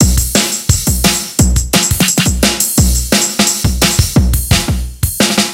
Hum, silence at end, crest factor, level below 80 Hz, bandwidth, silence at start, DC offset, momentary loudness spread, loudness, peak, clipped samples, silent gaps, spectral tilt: none; 0 s; 12 dB; -18 dBFS; 17.5 kHz; 0 s; under 0.1%; 3 LU; -11 LUFS; 0 dBFS; under 0.1%; none; -3.5 dB/octave